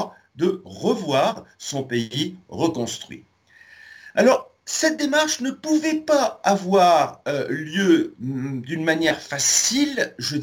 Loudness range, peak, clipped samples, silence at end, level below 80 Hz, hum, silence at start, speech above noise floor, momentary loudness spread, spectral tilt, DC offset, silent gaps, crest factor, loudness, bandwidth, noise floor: 6 LU; -4 dBFS; under 0.1%; 0 s; -64 dBFS; none; 0 s; 29 dB; 11 LU; -3.5 dB/octave; under 0.1%; none; 18 dB; -21 LUFS; 17 kHz; -51 dBFS